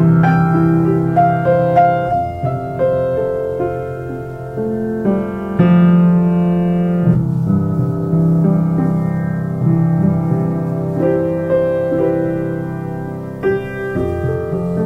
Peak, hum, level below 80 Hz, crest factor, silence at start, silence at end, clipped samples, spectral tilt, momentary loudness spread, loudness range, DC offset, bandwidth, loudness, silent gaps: 0 dBFS; none; -40 dBFS; 14 dB; 0 s; 0 s; under 0.1%; -10.5 dB/octave; 9 LU; 4 LU; under 0.1%; 3.8 kHz; -16 LUFS; none